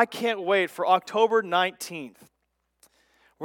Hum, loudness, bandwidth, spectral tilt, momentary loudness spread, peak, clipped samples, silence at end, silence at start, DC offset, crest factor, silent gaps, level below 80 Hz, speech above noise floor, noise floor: 60 Hz at -65 dBFS; -24 LUFS; 17.5 kHz; -3.5 dB/octave; 14 LU; -6 dBFS; under 0.1%; 0 s; 0 s; under 0.1%; 20 dB; none; -80 dBFS; 52 dB; -76 dBFS